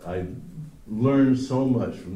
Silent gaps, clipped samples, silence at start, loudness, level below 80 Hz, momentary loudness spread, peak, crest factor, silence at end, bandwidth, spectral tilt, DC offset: none; under 0.1%; 0 s; -23 LUFS; -50 dBFS; 19 LU; -10 dBFS; 14 dB; 0 s; 9.8 kHz; -8.5 dB/octave; under 0.1%